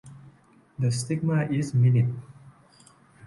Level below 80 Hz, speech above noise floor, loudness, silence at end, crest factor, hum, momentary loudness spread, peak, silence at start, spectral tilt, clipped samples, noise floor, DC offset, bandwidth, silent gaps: -62 dBFS; 33 dB; -25 LUFS; 0.75 s; 14 dB; none; 11 LU; -12 dBFS; 0.05 s; -7 dB/octave; under 0.1%; -57 dBFS; under 0.1%; 11.5 kHz; none